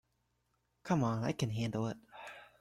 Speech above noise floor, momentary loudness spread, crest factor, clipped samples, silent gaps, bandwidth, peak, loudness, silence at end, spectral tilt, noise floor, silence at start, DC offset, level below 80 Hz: 45 dB; 17 LU; 18 dB; under 0.1%; none; 13.5 kHz; -20 dBFS; -36 LUFS; 0.15 s; -6.5 dB/octave; -80 dBFS; 0.85 s; under 0.1%; -66 dBFS